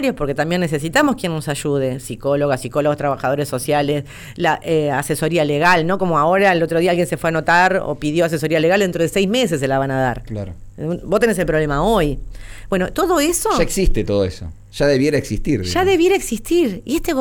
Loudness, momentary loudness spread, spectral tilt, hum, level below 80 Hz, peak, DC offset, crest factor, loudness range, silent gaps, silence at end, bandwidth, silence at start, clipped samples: -18 LUFS; 9 LU; -5 dB/octave; none; -32 dBFS; -4 dBFS; under 0.1%; 12 dB; 4 LU; none; 0 s; over 20 kHz; 0 s; under 0.1%